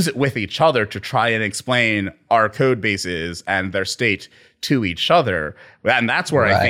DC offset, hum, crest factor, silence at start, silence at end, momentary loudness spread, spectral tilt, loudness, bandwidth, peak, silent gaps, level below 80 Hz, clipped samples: under 0.1%; none; 18 dB; 0 s; 0 s; 8 LU; -4.5 dB/octave; -19 LUFS; 16.5 kHz; -2 dBFS; none; -52 dBFS; under 0.1%